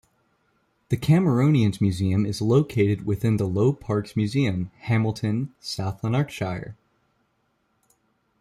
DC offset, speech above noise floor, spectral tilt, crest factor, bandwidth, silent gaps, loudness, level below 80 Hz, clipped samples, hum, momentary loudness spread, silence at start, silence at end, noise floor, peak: under 0.1%; 48 dB; -7.5 dB/octave; 16 dB; 14 kHz; none; -24 LUFS; -54 dBFS; under 0.1%; none; 10 LU; 0.9 s; 1.7 s; -70 dBFS; -8 dBFS